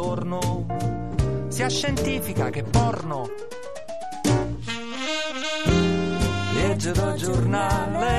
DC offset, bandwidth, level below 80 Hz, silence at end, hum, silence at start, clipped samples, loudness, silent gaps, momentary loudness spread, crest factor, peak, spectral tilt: 1%; 13 kHz; -36 dBFS; 0 s; none; 0 s; under 0.1%; -25 LUFS; none; 9 LU; 16 dB; -8 dBFS; -5.5 dB/octave